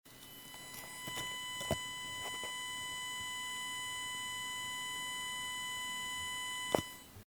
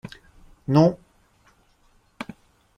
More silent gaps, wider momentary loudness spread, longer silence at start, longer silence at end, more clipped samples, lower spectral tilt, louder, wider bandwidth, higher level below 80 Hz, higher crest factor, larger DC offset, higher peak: neither; second, 8 LU vs 23 LU; second, 0.05 s vs 0.7 s; second, 0 s vs 0.55 s; neither; second, -1.5 dB/octave vs -8.5 dB/octave; second, -39 LUFS vs -20 LUFS; first, over 20 kHz vs 9.6 kHz; second, -66 dBFS vs -56 dBFS; first, 30 dB vs 22 dB; neither; second, -12 dBFS vs -4 dBFS